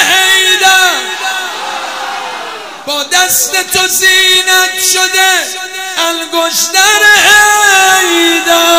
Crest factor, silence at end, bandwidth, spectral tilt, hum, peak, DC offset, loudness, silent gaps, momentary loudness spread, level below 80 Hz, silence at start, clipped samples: 10 dB; 0 s; over 20 kHz; 1 dB/octave; none; 0 dBFS; 0.5%; -7 LUFS; none; 14 LU; -50 dBFS; 0 s; 1%